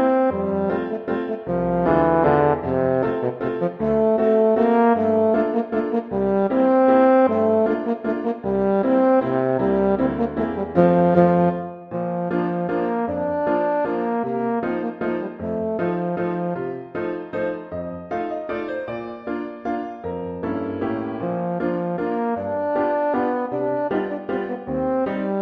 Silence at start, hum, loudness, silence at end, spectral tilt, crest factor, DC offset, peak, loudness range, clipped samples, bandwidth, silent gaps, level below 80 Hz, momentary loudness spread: 0 s; none; -21 LUFS; 0 s; -10.5 dB/octave; 18 dB; under 0.1%; -2 dBFS; 9 LU; under 0.1%; 5.2 kHz; none; -50 dBFS; 11 LU